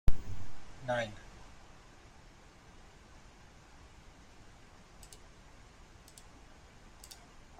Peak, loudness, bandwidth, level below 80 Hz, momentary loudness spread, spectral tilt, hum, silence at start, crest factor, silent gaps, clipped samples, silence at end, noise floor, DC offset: -12 dBFS; -45 LUFS; 12 kHz; -44 dBFS; 20 LU; -5 dB/octave; none; 0.05 s; 24 dB; none; under 0.1%; 6.45 s; -57 dBFS; under 0.1%